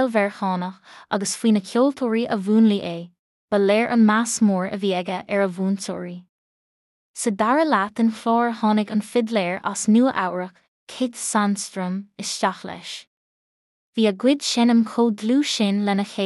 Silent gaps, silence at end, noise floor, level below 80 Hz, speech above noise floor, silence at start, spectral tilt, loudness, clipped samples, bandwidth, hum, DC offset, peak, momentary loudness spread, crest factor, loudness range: 3.19-3.48 s, 6.29-7.14 s, 10.68-10.87 s, 13.07-13.93 s; 0 s; under -90 dBFS; -72 dBFS; over 69 dB; 0 s; -4.5 dB/octave; -21 LUFS; under 0.1%; 12 kHz; none; under 0.1%; -6 dBFS; 14 LU; 14 dB; 5 LU